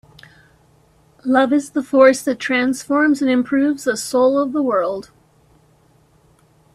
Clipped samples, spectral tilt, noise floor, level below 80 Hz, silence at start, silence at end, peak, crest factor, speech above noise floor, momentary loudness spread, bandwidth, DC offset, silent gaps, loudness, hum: under 0.1%; -4 dB/octave; -55 dBFS; -60 dBFS; 1.25 s; 1.75 s; 0 dBFS; 18 dB; 38 dB; 8 LU; 14 kHz; under 0.1%; none; -17 LUFS; none